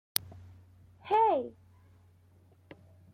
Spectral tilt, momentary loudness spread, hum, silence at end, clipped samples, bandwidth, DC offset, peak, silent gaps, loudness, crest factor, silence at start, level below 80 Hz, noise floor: -3 dB/octave; 26 LU; none; 1.65 s; under 0.1%; 16.5 kHz; under 0.1%; -4 dBFS; none; -29 LUFS; 30 dB; 0.25 s; -72 dBFS; -62 dBFS